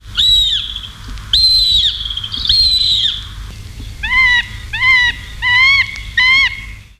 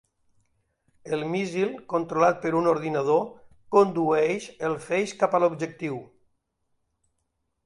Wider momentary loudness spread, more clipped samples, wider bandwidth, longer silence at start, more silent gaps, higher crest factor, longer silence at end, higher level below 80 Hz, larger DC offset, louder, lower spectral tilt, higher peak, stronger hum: first, 20 LU vs 10 LU; neither; first, 15.5 kHz vs 11.5 kHz; second, 0.05 s vs 1.05 s; neither; second, 12 dB vs 20 dB; second, 0.15 s vs 1.6 s; first, -30 dBFS vs -68 dBFS; neither; first, -10 LUFS vs -25 LUFS; second, -0.5 dB/octave vs -6 dB/octave; first, -2 dBFS vs -6 dBFS; neither